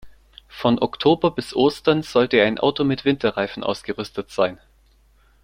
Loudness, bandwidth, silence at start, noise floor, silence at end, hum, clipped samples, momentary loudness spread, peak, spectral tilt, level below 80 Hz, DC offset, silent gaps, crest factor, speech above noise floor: -21 LUFS; 15.5 kHz; 0.05 s; -56 dBFS; 0.9 s; none; under 0.1%; 10 LU; -2 dBFS; -6 dB/octave; -54 dBFS; under 0.1%; none; 18 dB; 36 dB